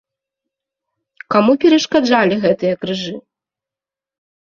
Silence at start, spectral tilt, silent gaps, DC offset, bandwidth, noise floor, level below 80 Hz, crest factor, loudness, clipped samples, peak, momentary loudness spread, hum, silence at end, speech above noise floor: 1.3 s; -5 dB/octave; none; under 0.1%; 7.4 kHz; -89 dBFS; -58 dBFS; 16 dB; -15 LUFS; under 0.1%; -2 dBFS; 11 LU; none; 1.2 s; 75 dB